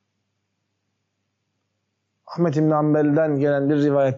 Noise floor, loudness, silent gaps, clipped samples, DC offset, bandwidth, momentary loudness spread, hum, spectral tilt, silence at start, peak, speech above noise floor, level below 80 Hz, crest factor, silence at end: -75 dBFS; -20 LUFS; none; under 0.1%; under 0.1%; 7.4 kHz; 5 LU; none; -8 dB/octave; 2.25 s; -10 dBFS; 57 dB; -74 dBFS; 12 dB; 0 s